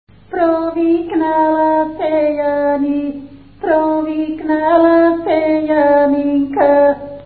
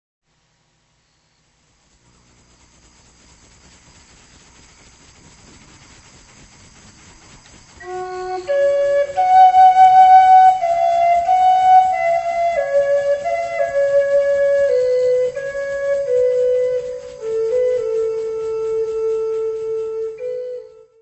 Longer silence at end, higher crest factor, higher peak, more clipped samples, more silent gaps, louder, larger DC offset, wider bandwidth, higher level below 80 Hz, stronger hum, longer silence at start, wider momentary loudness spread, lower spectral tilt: second, 0 s vs 0.35 s; about the same, 14 dB vs 16 dB; about the same, 0 dBFS vs 0 dBFS; neither; neither; about the same, -14 LUFS vs -15 LUFS; first, 0.4% vs under 0.1%; second, 4.6 kHz vs 8.4 kHz; about the same, -50 dBFS vs -54 dBFS; neither; second, 0.3 s vs 7.8 s; second, 8 LU vs 17 LU; first, -11.5 dB/octave vs -3.5 dB/octave